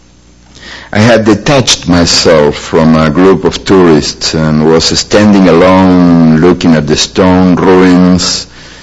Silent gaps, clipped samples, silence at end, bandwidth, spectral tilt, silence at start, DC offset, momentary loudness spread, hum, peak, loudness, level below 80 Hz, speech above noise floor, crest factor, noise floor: none; 5%; 0.15 s; 11 kHz; -5 dB/octave; 0.65 s; 0.3%; 5 LU; none; 0 dBFS; -6 LUFS; -30 dBFS; 34 dB; 6 dB; -39 dBFS